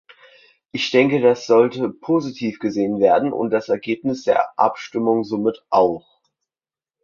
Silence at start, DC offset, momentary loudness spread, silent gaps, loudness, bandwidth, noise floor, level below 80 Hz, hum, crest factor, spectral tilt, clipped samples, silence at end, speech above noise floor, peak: 0.75 s; under 0.1%; 8 LU; none; -19 LUFS; 7.2 kHz; under -90 dBFS; -62 dBFS; none; 18 dB; -6 dB/octave; under 0.1%; 1.05 s; over 72 dB; -2 dBFS